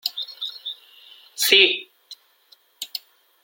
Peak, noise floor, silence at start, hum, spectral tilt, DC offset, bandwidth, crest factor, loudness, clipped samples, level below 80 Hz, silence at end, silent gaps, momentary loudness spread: 0 dBFS; -58 dBFS; 0.05 s; none; 1 dB/octave; under 0.1%; 17 kHz; 24 dB; -18 LUFS; under 0.1%; -80 dBFS; 0.45 s; none; 25 LU